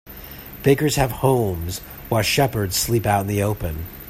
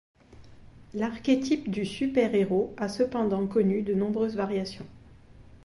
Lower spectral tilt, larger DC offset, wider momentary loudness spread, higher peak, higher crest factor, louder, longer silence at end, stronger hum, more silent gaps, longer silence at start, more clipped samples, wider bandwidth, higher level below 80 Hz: second, -5 dB/octave vs -6.5 dB/octave; neither; first, 13 LU vs 8 LU; first, -2 dBFS vs -12 dBFS; about the same, 18 dB vs 18 dB; first, -21 LUFS vs -27 LUFS; about the same, 0 s vs 0.1 s; neither; neither; second, 0.05 s vs 0.3 s; neither; first, 16 kHz vs 11.5 kHz; first, -40 dBFS vs -56 dBFS